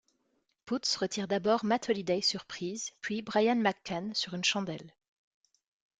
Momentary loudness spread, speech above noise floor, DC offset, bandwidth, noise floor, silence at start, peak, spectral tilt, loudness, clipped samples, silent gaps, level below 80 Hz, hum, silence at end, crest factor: 9 LU; 45 dB; under 0.1%; 9.6 kHz; -77 dBFS; 0.65 s; -12 dBFS; -3.5 dB/octave; -31 LUFS; under 0.1%; none; -74 dBFS; none; 1.1 s; 20 dB